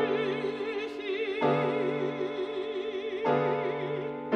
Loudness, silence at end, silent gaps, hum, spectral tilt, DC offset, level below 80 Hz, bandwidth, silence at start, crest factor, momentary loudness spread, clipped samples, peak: -31 LUFS; 0 s; none; none; -7 dB/octave; under 0.1%; -70 dBFS; 8.8 kHz; 0 s; 16 dB; 7 LU; under 0.1%; -14 dBFS